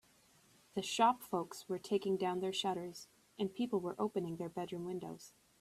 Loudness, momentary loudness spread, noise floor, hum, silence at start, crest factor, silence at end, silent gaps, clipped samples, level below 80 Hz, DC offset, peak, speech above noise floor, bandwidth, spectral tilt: -38 LUFS; 17 LU; -68 dBFS; none; 0.75 s; 20 dB; 0.3 s; none; under 0.1%; -78 dBFS; under 0.1%; -20 dBFS; 31 dB; 15 kHz; -4.5 dB/octave